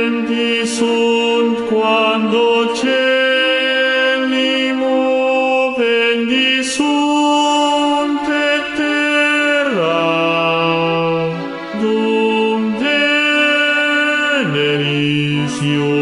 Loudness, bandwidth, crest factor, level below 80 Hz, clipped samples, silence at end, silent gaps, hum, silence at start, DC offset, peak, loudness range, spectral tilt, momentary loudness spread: -14 LUFS; 11.5 kHz; 14 dB; -58 dBFS; under 0.1%; 0 s; none; none; 0 s; under 0.1%; -2 dBFS; 1 LU; -4.5 dB/octave; 4 LU